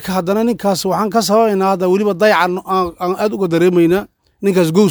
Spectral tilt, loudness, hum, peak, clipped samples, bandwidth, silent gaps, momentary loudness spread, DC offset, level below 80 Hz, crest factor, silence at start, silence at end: -5.5 dB/octave; -15 LUFS; none; 0 dBFS; under 0.1%; over 20 kHz; none; 6 LU; under 0.1%; -50 dBFS; 14 dB; 0 s; 0 s